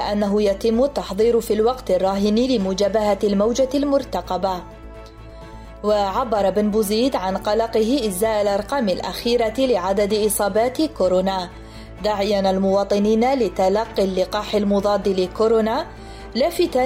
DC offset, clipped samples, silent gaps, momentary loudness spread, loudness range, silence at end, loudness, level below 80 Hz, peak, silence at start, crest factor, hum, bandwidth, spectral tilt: under 0.1%; under 0.1%; none; 8 LU; 3 LU; 0 s; -20 LUFS; -40 dBFS; -8 dBFS; 0 s; 12 dB; none; 16 kHz; -5 dB/octave